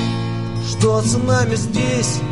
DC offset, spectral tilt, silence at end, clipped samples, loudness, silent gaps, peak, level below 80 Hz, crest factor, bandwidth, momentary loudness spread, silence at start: 1%; -5 dB/octave; 0 s; under 0.1%; -18 LUFS; none; -2 dBFS; -40 dBFS; 16 dB; 11.5 kHz; 7 LU; 0 s